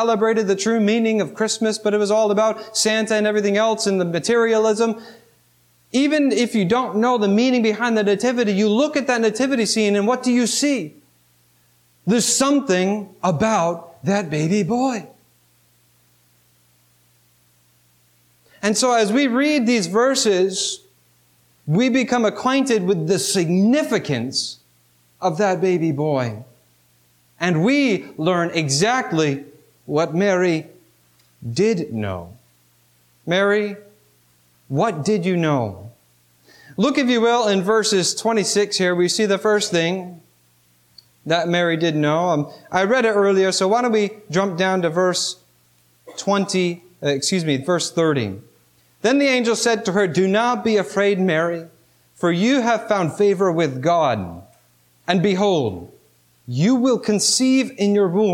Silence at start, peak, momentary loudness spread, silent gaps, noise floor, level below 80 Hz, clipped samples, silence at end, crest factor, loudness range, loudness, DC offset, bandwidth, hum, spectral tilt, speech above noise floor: 0 s; -4 dBFS; 8 LU; none; -58 dBFS; -64 dBFS; under 0.1%; 0 s; 16 dB; 5 LU; -19 LUFS; under 0.1%; 16.5 kHz; 60 Hz at -50 dBFS; -4.5 dB/octave; 40 dB